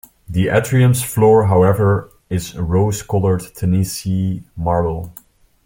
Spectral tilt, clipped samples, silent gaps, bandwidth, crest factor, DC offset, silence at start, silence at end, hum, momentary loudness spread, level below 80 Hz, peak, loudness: -6.5 dB/octave; under 0.1%; none; 17 kHz; 14 dB; under 0.1%; 0.3 s; 0.55 s; none; 12 LU; -40 dBFS; -2 dBFS; -17 LUFS